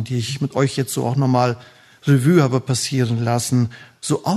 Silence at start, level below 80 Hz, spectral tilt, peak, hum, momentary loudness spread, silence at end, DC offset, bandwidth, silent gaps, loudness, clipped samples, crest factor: 0 s; -58 dBFS; -6 dB/octave; -2 dBFS; none; 9 LU; 0 s; under 0.1%; 13.5 kHz; none; -19 LUFS; under 0.1%; 16 dB